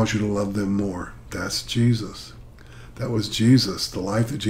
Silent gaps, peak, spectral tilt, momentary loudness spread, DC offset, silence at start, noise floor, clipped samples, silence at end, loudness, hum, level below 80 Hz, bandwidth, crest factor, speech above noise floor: none; -6 dBFS; -5.5 dB/octave; 17 LU; under 0.1%; 0 s; -43 dBFS; under 0.1%; 0 s; -23 LUFS; none; -46 dBFS; 16 kHz; 18 dB; 20 dB